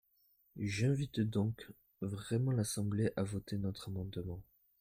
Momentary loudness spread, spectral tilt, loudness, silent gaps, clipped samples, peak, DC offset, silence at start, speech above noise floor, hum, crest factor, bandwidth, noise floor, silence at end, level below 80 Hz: 12 LU; -6.5 dB/octave; -38 LUFS; none; under 0.1%; -22 dBFS; under 0.1%; 0.55 s; 37 dB; none; 16 dB; 16 kHz; -73 dBFS; 0.4 s; -64 dBFS